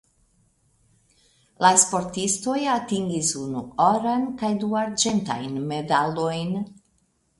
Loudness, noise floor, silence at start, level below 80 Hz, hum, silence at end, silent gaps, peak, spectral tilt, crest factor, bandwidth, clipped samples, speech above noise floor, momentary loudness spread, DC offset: -23 LUFS; -67 dBFS; 1.6 s; -60 dBFS; none; 0.65 s; none; -2 dBFS; -3.5 dB/octave; 22 dB; 11.5 kHz; under 0.1%; 44 dB; 11 LU; under 0.1%